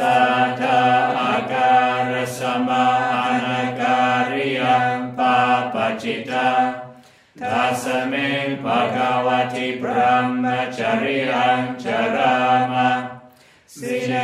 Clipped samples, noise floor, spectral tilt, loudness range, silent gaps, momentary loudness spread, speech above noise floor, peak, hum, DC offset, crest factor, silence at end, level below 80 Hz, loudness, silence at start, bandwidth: under 0.1%; -49 dBFS; -5 dB/octave; 3 LU; none; 7 LU; 30 dB; -4 dBFS; none; under 0.1%; 16 dB; 0 s; -66 dBFS; -19 LUFS; 0 s; 14.5 kHz